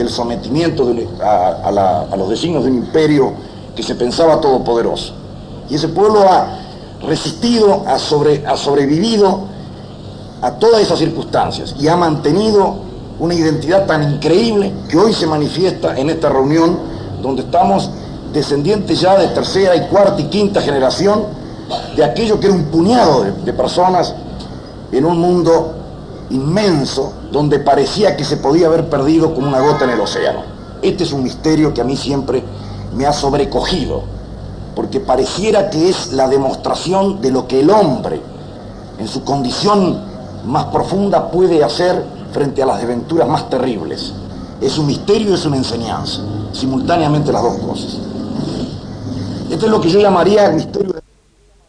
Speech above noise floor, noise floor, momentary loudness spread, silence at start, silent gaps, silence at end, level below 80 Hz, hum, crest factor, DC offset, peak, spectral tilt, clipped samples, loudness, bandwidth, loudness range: 37 dB; -50 dBFS; 14 LU; 0 s; none; 0.7 s; -36 dBFS; none; 14 dB; under 0.1%; 0 dBFS; -6 dB/octave; under 0.1%; -14 LUFS; 10.5 kHz; 4 LU